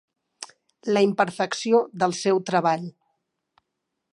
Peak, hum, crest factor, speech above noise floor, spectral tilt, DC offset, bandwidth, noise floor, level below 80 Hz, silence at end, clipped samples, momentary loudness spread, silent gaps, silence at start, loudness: -6 dBFS; none; 18 dB; 58 dB; -5 dB/octave; under 0.1%; 11.5 kHz; -81 dBFS; -76 dBFS; 1.2 s; under 0.1%; 20 LU; none; 0.4 s; -23 LUFS